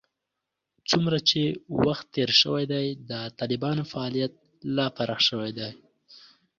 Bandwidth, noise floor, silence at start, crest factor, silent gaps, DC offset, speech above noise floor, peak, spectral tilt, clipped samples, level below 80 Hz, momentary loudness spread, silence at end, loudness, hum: 7.6 kHz; -84 dBFS; 0.9 s; 22 dB; none; under 0.1%; 58 dB; -6 dBFS; -5 dB/octave; under 0.1%; -62 dBFS; 13 LU; 0.4 s; -25 LUFS; none